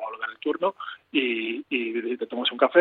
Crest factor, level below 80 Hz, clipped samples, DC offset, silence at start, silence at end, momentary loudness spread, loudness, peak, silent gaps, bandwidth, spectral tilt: 22 dB; -80 dBFS; under 0.1%; under 0.1%; 0 s; 0 s; 7 LU; -26 LUFS; -4 dBFS; none; 4.5 kHz; -6.5 dB/octave